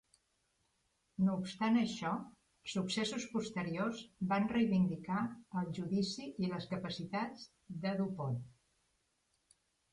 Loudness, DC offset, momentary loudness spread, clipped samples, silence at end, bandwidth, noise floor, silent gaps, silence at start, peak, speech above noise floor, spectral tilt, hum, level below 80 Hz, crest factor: -37 LUFS; under 0.1%; 11 LU; under 0.1%; 1.4 s; 11 kHz; -80 dBFS; none; 1.2 s; -22 dBFS; 43 dB; -6 dB/octave; none; -70 dBFS; 16 dB